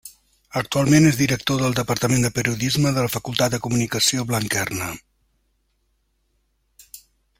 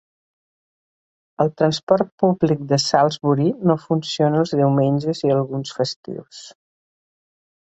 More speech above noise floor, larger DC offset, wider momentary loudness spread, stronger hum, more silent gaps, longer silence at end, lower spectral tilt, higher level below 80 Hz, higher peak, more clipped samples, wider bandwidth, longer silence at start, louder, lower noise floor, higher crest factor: second, 48 dB vs over 71 dB; neither; about the same, 11 LU vs 9 LU; neither; second, none vs 1.83-1.87 s, 2.12-2.18 s, 5.96-6.03 s; second, 0.45 s vs 1.15 s; second, -4.5 dB/octave vs -6.5 dB/octave; first, -50 dBFS vs -60 dBFS; about the same, -2 dBFS vs -2 dBFS; neither; first, 16.5 kHz vs 8.2 kHz; second, 0.05 s vs 1.4 s; about the same, -20 LUFS vs -19 LUFS; second, -68 dBFS vs under -90 dBFS; about the same, 20 dB vs 18 dB